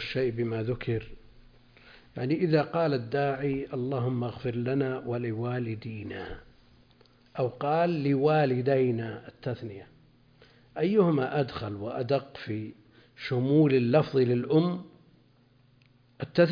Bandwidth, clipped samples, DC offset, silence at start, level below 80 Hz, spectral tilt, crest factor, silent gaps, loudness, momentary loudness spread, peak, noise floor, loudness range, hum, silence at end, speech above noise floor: 5.2 kHz; under 0.1%; under 0.1%; 0 s; -58 dBFS; -9.5 dB/octave; 18 dB; none; -28 LUFS; 15 LU; -10 dBFS; -62 dBFS; 5 LU; none; 0 s; 35 dB